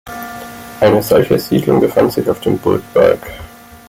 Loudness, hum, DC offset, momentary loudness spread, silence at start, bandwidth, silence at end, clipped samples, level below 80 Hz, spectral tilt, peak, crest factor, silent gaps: -13 LUFS; none; under 0.1%; 17 LU; 0.05 s; 16.5 kHz; 0.1 s; under 0.1%; -44 dBFS; -6.5 dB/octave; 0 dBFS; 14 dB; none